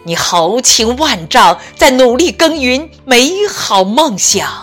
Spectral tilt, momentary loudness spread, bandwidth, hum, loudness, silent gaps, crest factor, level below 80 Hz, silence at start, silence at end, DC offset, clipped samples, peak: -2 dB/octave; 5 LU; over 20 kHz; none; -9 LUFS; none; 10 dB; -38 dBFS; 0.05 s; 0 s; under 0.1%; 0.4%; 0 dBFS